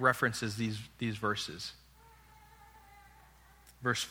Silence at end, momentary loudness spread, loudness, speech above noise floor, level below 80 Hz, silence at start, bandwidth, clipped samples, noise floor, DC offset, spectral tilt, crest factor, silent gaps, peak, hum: 0 s; 25 LU; -35 LUFS; 26 dB; -64 dBFS; 0 s; over 20 kHz; under 0.1%; -60 dBFS; under 0.1%; -4 dB/octave; 24 dB; none; -12 dBFS; none